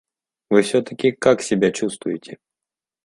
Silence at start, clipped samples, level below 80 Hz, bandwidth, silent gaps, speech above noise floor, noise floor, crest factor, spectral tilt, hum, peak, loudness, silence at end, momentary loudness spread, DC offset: 0.5 s; under 0.1%; -62 dBFS; 11.5 kHz; none; 69 dB; -88 dBFS; 20 dB; -5 dB/octave; none; 0 dBFS; -20 LUFS; 0.7 s; 11 LU; under 0.1%